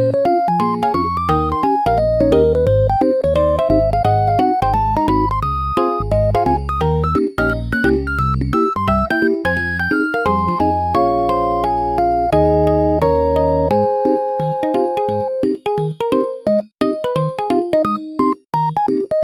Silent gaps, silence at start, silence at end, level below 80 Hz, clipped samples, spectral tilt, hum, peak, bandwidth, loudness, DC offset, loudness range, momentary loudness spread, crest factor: none; 0 s; 0 s; -30 dBFS; under 0.1%; -8 dB/octave; none; -2 dBFS; 15.5 kHz; -17 LUFS; under 0.1%; 3 LU; 4 LU; 14 dB